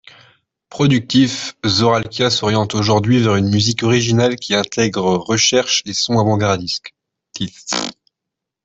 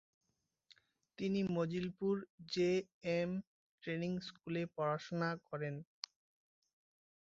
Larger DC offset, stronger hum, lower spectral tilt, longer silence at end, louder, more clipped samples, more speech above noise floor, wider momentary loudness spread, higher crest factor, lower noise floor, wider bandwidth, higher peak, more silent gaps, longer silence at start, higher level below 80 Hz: neither; neither; about the same, -4.5 dB/octave vs -5.5 dB/octave; second, 0.75 s vs 1.4 s; first, -16 LUFS vs -40 LUFS; neither; first, 66 dB vs 32 dB; about the same, 9 LU vs 10 LU; second, 14 dB vs 20 dB; first, -82 dBFS vs -71 dBFS; about the same, 8.2 kHz vs 7.6 kHz; first, -2 dBFS vs -22 dBFS; second, none vs 2.30-2.38 s, 2.94-3.01 s, 3.47-3.78 s; second, 0.7 s vs 1.2 s; first, -52 dBFS vs -76 dBFS